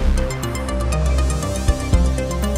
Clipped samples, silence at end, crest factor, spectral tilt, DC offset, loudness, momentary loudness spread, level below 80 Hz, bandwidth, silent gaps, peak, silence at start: under 0.1%; 0 s; 16 dB; -5.5 dB/octave; under 0.1%; -21 LUFS; 5 LU; -20 dBFS; 15 kHz; none; -2 dBFS; 0 s